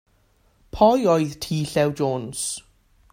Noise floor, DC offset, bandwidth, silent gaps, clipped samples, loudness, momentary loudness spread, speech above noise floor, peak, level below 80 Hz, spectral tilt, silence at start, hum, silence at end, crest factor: -61 dBFS; under 0.1%; 16 kHz; none; under 0.1%; -22 LUFS; 11 LU; 40 dB; -2 dBFS; -50 dBFS; -5 dB/octave; 0.75 s; none; 0.5 s; 20 dB